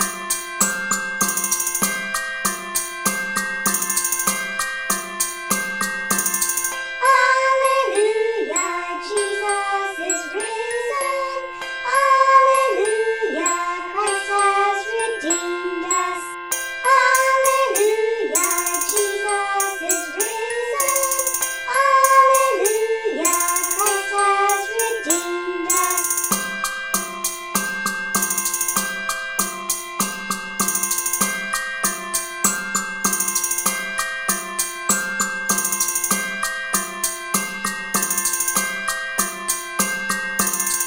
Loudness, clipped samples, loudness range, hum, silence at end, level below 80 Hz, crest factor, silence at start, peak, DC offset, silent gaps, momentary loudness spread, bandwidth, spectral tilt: -19 LUFS; under 0.1%; 4 LU; none; 0 s; -56 dBFS; 20 dB; 0 s; -2 dBFS; under 0.1%; none; 8 LU; 17 kHz; -1 dB/octave